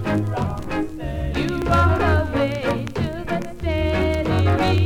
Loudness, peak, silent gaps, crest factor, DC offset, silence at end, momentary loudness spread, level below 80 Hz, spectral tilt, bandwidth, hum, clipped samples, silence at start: -22 LUFS; -4 dBFS; none; 16 dB; under 0.1%; 0 s; 9 LU; -32 dBFS; -7 dB/octave; 12.5 kHz; none; under 0.1%; 0 s